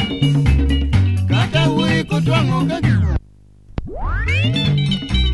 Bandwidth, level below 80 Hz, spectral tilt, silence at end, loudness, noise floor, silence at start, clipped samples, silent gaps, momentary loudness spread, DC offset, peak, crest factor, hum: 11.5 kHz; -24 dBFS; -6.5 dB/octave; 0 s; -17 LUFS; -46 dBFS; 0 s; under 0.1%; none; 10 LU; 0.3%; -2 dBFS; 14 dB; none